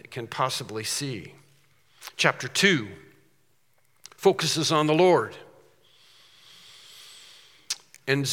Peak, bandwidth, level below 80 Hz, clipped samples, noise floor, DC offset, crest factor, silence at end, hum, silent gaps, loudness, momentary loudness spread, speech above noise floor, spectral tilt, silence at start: -2 dBFS; 17.5 kHz; -76 dBFS; under 0.1%; -69 dBFS; under 0.1%; 26 dB; 0 s; none; none; -24 LUFS; 25 LU; 45 dB; -3.5 dB/octave; 0.1 s